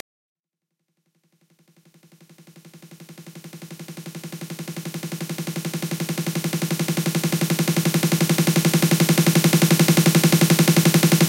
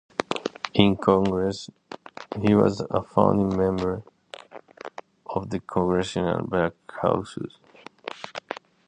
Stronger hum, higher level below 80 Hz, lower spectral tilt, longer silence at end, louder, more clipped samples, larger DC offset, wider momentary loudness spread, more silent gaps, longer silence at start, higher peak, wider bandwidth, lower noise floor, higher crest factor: neither; second, -66 dBFS vs -50 dBFS; second, -4.5 dB/octave vs -6.5 dB/octave; second, 0 s vs 0.35 s; first, -19 LUFS vs -24 LUFS; neither; neither; about the same, 20 LU vs 20 LU; neither; first, 2.75 s vs 0.2 s; about the same, -4 dBFS vs -2 dBFS; first, 17 kHz vs 9.6 kHz; first, -81 dBFS vs -45 dBFS; second, 16 dB vs 24 dB